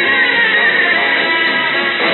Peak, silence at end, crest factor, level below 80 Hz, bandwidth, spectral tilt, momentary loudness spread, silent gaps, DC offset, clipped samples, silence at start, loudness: -4 dBFS; 0 s; 10 dB; -58 dBFS; 4.3 kHz; 1 dB/octave; 3 LU; none; under 0.1%; under 0.1%; 0 s; -11 LUFS